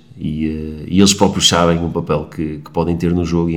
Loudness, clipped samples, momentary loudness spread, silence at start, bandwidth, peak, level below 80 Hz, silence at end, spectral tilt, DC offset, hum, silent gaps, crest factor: -16 LUFS; 0.1%; 12 LU; 0.15 s; 16 kHz; 0 dBFS; -36 dBFS; 0 s; -4.5 dB/octave; 0.3%; none; none; 16 dB